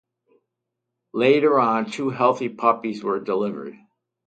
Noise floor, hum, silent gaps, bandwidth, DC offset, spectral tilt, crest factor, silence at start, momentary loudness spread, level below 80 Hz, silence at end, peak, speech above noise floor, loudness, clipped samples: -82 dBFS; none; none; 9 kHz; under 0.1%; -6.5 dB/octave; 20 dB; 1.15 s; 12 LU; -72 dBFS; 0.55 s; -2 dBFS; 61 dB; -21 LUFS; under 0.1%